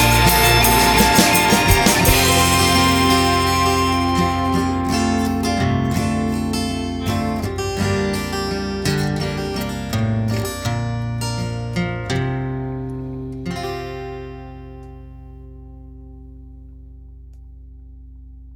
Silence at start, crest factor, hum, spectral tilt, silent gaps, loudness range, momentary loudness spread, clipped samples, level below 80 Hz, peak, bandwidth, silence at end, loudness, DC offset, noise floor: 0 s; 18 dB; none; -4 dB/octave; none; 17 LU; 16 LU; under 0.1%; -32 dBFS; 0 dBFS; over 20 kHz; 0 s; -18 LUFS; under 0.1%; -39 dBFS